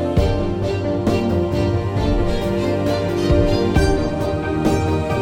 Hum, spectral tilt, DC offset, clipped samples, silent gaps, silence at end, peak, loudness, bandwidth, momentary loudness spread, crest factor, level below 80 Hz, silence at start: none; -7 dB/octave; under 0.1%; under 0.1%; none; 0 s; -2 dBFS; -19 LUFS; 16.5 kHz; 4 LU; 16 dB; -26 dBFS; 0 s